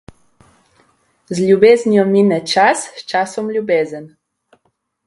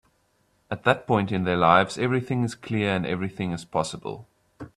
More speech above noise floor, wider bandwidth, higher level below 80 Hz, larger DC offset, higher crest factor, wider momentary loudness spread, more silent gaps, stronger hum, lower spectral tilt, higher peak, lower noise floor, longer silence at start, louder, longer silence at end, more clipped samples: first, 52 dB vs 43 dB; about the same, 11.5 kHz vs 12 kHz; about the same, -58 dBFS vs -58 dBFS; neither; second, 16 dB vs 22 dB; second, 12 LU vs 17 LU; neither; neither; about the same, -5 dB/octave vs -6 dB/octave; about the same, 0 dBFS vs -2 dBFS; about the same, -65 dBFS vs -67 dBFS; first, 1.3 s vs 0.7 s; first, -14 LUFS vs -24 LUFS; first, 1 s vs 0.1 s; neither